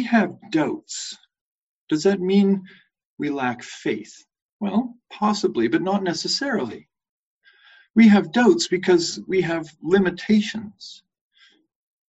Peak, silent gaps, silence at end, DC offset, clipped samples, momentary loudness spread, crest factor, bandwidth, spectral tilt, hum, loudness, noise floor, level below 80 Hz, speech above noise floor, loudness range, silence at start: -4 dBFS; 1.41-1.87 s, 3.05-3.17 s, 4.42-4.60 s, 7.09-7.41 s, 7.90-7.94 s; 1.15 s; under 0.1%; under 0.1%; 15 LU; 18 dB; 8.2 kHz; -5 dB/octave; none; -21 LUFS; -58 dBFS; -62 dBFS; 38 dB; 6 LU; 0 s